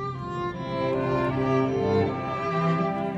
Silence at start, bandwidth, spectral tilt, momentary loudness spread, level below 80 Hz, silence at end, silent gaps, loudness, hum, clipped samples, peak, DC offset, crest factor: 0 s; 8 kHz; -8 dB/octave; 7 LU; -50 dBFS; 0 s; none; -26 LUFS; none; under 0.1%; -12 dBFS; under 0.1%; 14 dB